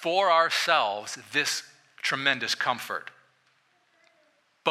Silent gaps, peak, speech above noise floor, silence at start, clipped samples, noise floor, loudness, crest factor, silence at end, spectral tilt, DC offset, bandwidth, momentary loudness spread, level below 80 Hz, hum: none; -6 dBFS; 41 dB; 0 s; under 0.1%; -67 dBFS; -26 LUFS; 22 dB; 0 s; -1.5 dB/octave; under 0.1%; 15.5 kHz; 13 LU; -82 dBFS; none